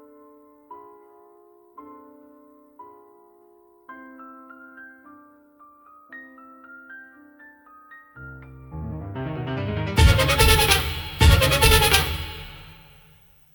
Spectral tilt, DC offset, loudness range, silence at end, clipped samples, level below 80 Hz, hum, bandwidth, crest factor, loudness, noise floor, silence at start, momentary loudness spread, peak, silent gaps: -3.5 dB/octave; under 0.1%; 25 LU; 0.8 s; under 0.1%; -32 dBFS; none; 19 kHz; 24 dB; -19 LUFS; -55 dBFS; 0.7 s; 28 LU; 0 dBFS; none